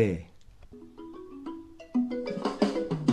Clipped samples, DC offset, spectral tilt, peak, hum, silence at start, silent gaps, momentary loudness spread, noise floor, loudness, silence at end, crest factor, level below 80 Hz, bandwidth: under 0.1%; under 0.1%; -7 dB/octave; -10 dBFS; none; 0 s; none; 20 LU; -50 dBFS; -31 LUFS; 0 s; 20 dB; -56 dBFS; 10.5 kHz